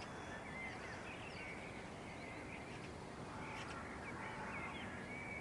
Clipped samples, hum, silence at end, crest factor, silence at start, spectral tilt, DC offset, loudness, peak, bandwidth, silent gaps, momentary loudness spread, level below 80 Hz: under 0.1%; none; 0 s; 14 dB; 0 s; -5 dB/octave; under 0.1%; -49 LUFS; -34 dBFS; 12 kHz; none; 4 LU; -66 dBFS